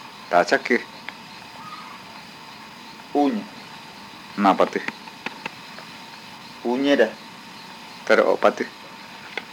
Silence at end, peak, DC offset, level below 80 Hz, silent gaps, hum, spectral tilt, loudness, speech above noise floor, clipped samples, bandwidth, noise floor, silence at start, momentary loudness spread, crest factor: 0 s; -2 dBFS; under 0.1%; -70 dBFS; none; none; -4.5 dB/octave; -22 LUFS; 21 dB; under 0.1%; 19 kHz; -41 dBFS; 0 s; 20 LU; 24 dB